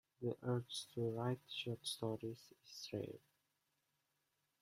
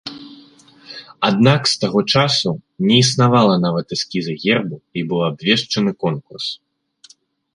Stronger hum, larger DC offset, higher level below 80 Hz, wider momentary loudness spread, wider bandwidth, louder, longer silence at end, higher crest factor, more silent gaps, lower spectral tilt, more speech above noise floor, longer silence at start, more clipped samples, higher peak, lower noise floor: neither; neither; second, -82 dBFS vs -56 dBFS; about the same, 11 LU vs 13 LU; first, 16 kHz vs 11.5 kHz; second, -45 LUFS vs -17 LUFS; first, 1.45 s vs 1 s; about the same, 20 dB vs 18 dB; neither; about the same, -5.5 dB/octave vs -5 dB/octave; first, 41 dB vs 33 dB; first, 0.2 s vs 0.05 s; neither; second, -26 dBFS vs -2 dBFS; first, -86 dBFS vs -50 dBFS